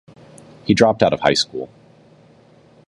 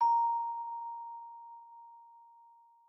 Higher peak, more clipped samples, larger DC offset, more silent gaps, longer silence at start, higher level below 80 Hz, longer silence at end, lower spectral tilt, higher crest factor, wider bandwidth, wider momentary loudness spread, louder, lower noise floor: first, 0 dBFS vs -22 dBFS; neither; neither; neither; first, 0.65 s vs 0 s; first, -50 dBFS vs under -90 dBFS; first, 1.25 s vs 0.65 s; first, -4.5 dB/octave vs 0.5 dB/octave; about the same, 20 dB vs 16 dB; first, 11.5 kHz vs 5.8 kHz; second, 17 LU vs 25 LU; first, -17 LUFS vs -35 LUFS; second, -50 dBFS vs -61 dBFS